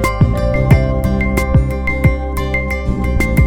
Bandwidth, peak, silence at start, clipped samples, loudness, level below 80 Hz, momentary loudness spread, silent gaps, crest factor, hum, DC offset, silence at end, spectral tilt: 17 kHz; 0 dBFS; 0 s; under 0.1%; -15 LUFS; -18 dBFS; 6 LU; none; 14 dB; none; under 0.1%; 0 s; -7.5 dB/octave